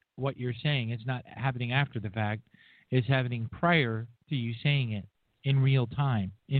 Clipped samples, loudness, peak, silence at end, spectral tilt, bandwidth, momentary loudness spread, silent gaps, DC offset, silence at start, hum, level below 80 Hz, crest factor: under 0.1%; -30 LUFS; -10 dBFS; 0 s; -10 dB/octave; 4.5 kHz; 10 LU; none; under 0.1%; 0.15 s; none; -62 dBFS; 20 dB